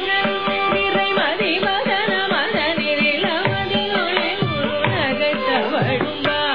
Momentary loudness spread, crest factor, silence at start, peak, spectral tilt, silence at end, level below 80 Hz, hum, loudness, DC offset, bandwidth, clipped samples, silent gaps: 3 LU; 18 dB; 0 s; -2 dBFS; -7 dB/octave; 0 s; -50 dBFS; none; -19 LUFS; 0.9%; 5.4 kHz; under 0.1%; none